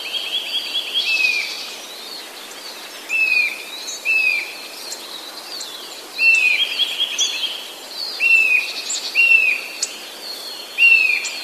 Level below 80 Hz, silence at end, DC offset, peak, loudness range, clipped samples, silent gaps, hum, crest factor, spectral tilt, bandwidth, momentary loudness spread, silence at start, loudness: -76 dBFS; 0 s; under 0.1%; -2 dBFS; 5 LU; under 0.1%; none; none; 18 dB; 3 dB/octave; 14.5 kHz; 19 LU; 0 s; -16 LUFS